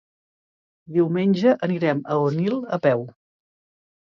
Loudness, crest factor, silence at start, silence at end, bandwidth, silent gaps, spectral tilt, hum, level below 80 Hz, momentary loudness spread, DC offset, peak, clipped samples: -22 LUFS; 18 dB; 0.9 s; 1.05 s; 7 kHz; none; -8.5 dB/octave; none; -70 dBFS; 6 LU; under 0.1%; -6 dBFS; under 0.1%